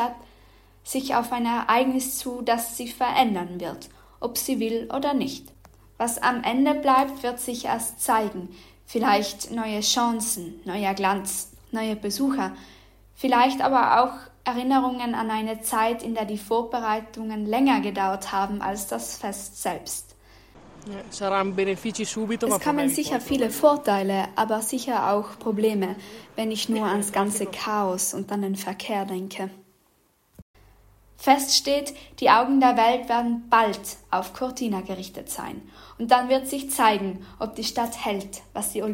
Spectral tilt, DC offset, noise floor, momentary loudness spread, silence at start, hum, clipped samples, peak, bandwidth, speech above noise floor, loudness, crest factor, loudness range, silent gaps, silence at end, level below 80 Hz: -3.5 dB/octave; under 0.1%; -64 dBFS; 13 LU; 0 s; none; under 0.1%; -4 dBFS; 16.5 kHz; 40 dB; -24 LUFS; 20 dB; 6 LU; 30.42-30.54 s; 0 s; -56 dBFS